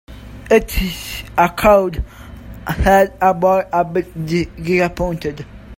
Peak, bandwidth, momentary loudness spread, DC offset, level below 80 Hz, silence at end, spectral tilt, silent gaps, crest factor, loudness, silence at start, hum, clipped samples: 0 dBFS; 16.5 kHz; 19 LU; under 0.1%; -30 dBFS; 0.05 s; -6 dB/octave; none; 16 dB; -16 LUFS; 0.1 s; none; under 0.1%